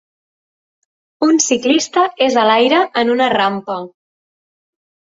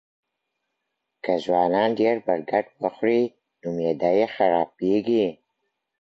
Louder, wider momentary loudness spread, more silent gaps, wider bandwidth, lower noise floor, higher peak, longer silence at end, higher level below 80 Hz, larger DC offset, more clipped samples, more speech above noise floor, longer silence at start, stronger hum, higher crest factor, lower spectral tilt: first, -14 LUFS vs -23 LUFS; first, 11 LU vs 8 LU; neither; about the same, 7.8 kHz vs 7.6 kHz; first, under -90 dBFS vs -80 dBFS; first, -2 dBFS vs -6 dBFS; first, 1.15 s vs 0.65 s; about the same, -62 dBFS vs -66 dBFS; neither; neither; first, over 76 dB vs 58 dB; about the same, 1.2 s vs 1.25 s; neither; about the same, 16 dB vs 18 dB; second, -2.5 dB/octave vs -7.5 dB/octave